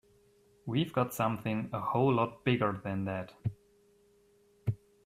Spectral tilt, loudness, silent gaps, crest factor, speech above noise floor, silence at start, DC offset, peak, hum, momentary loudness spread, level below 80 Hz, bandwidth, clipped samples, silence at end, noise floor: -7 dB/octave; -33 LUFS; none; 20 dB; 35 dB; 0.65 s; under 0.1%; -14 dBFS; none; 11 LU; -66 dBFS; 15.5 kHz; under 0.1%; 0.3 s; -66 dBFS